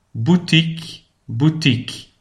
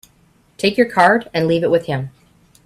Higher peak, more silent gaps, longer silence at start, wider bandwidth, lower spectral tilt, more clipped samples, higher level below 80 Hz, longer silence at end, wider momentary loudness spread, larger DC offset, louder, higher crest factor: about the same, -2 dBFS vs 0 dBFS; neither; second, 0.15 s vs 0.6 s; second, 11.5 kHz vs 14 kHz; about the same, -6 dB/octave vs -6 dB/octave; neither; about the same, -52 dBFS vs -54 dBFS; second, 0.15 s vs 0.55 s; first, 17 LU vs 12 LU; neither; about the same, -17 LUFS vs -16 LUFS; about the same, 18 dB vs 18 dB